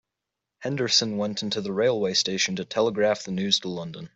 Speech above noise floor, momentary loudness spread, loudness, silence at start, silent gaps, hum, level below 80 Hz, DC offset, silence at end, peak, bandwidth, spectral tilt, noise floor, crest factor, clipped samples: 60 dB; 9 LU; -24 LUFS; 0.6 s; none; none; -66 dBFS; under 0.1%; 0.1 s; -8 dBFS; 8.2 kHz; -3.5 dB/octave; -85 dBFS; 18 dB; under 0.1%